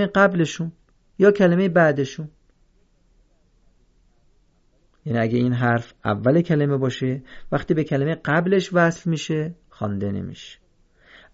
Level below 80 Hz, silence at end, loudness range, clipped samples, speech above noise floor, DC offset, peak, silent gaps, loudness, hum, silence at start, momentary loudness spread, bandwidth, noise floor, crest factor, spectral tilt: -54 dBFS; 0.8 s; 7 LU; under 0.1%; 40 dB; under 0.1%; -4 dBFS; none; -21 LUFS; none; 0 s; 15 LU; 7.8 kHz; -60 dBFS; 18 dB; -7 dB/octave